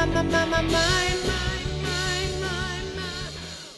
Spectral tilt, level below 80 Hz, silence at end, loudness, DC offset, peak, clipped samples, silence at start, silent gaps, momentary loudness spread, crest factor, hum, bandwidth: -4 dB/octave; -34 dBFS; 0 s; -25 LUFS; under 0.1%; -8 dBFS; under 0.1%; 0 s; none; 10 LU; 18 dB; none; 12.5 kHz